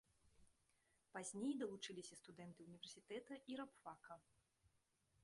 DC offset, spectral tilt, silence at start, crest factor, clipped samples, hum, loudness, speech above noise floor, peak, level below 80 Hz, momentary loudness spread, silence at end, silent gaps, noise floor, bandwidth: under 0.1%; -4 dB/octave; 0.25 s; 18 dB; under 0.1%; none; -53 LUFS; 31 dB; -36 dBFS; -88 dBFS; 14 LU; 1.05 s; none; -84 dBFS; 11.5 kHz